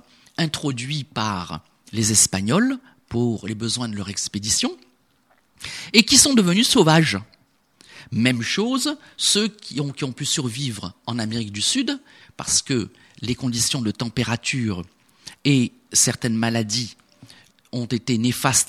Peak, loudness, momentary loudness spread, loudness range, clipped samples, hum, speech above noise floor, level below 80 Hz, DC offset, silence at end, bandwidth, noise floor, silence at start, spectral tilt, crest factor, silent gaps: 0 dBFS; -20 LUFS; 15 LU; 6 LU; under 0.1%; none; 41 dB; -54 dBFS; under 0.1%; 0.05 s; 14.5 kHz; -62 dBFS; 0.4 s; -3 dB/octave; 22 dB; none